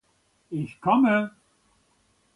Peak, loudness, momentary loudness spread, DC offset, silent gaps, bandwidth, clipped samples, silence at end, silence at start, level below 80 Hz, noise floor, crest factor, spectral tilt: -8 dBFS; -24 LUFS; 15 LU; under 0.1%; none; 11 kHz; under 0.1%; 1.05 s; 0.5 s; -68 dBFS; -67 dBFS; 20 dB; -8 dB/octave